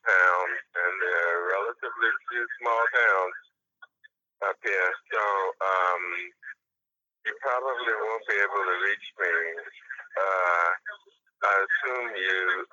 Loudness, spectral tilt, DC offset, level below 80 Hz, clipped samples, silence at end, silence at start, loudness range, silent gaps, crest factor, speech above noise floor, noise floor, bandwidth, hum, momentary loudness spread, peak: -26 LUFS; 0 dB/octave; under 0.1%; under -90 dBFS; under 0.1%; 0.05 s; 0.05 s; 3 LU; none; 20 dB; 61 dB; -88 dBFS; 7.6 kHz; none; 12 LU; -8 dBFS